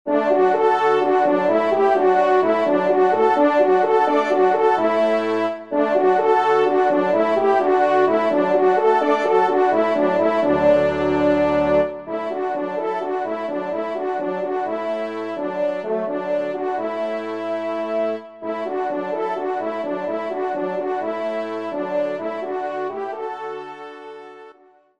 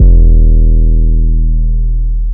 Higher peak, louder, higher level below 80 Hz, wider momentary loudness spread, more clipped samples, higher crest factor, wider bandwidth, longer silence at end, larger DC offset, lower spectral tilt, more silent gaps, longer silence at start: second, -4 dBFS vs 0 dBFS; second, -20 LUFS vs -12 LUFS; second, -56 dBFS vs -6 dBFS; first, 10 LU vs 7 LU; second, under 0.1% vs 2%; first, 16 dB vs 6 dB; first, 8.6 kHz vs 0.7 kHz; first, 0.5 s vs 0 s; second, 0.2% vs 4%; second, -6.5 dB/octave vs -15.5 dB/octave; neither; about the same, 0.05 s vs 0 s